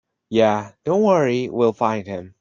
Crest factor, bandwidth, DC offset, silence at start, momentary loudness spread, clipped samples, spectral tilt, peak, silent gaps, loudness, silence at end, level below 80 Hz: 16 dB; 7.4 kHz; under 0.1%; 0.3 s; 8 LU; under 0.1%; -6.5 dB/octave; -4 dBFS; none; -20 LUFS; 0.15 s; -62 dBFS